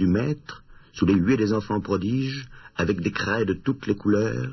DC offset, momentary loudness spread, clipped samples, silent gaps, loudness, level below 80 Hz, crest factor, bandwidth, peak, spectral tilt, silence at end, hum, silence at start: under 0.1%; 14 LU; under 0.1%; none; -24 LUFS; -48 dBFS; 18 dB; 6.2 kHz; -6 dBFS; -7 dB/octave; 0 s; none; 0 s